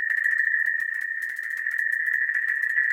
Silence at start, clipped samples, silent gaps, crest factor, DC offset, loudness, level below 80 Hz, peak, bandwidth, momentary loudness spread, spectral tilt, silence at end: 0 s; under 0.1%; none; 14 dB; under 0.1%; -23 LUFS; -84 dBFS; -10 dBFS; 17 kHz; 7 LU; 2 dB/octave; 0 s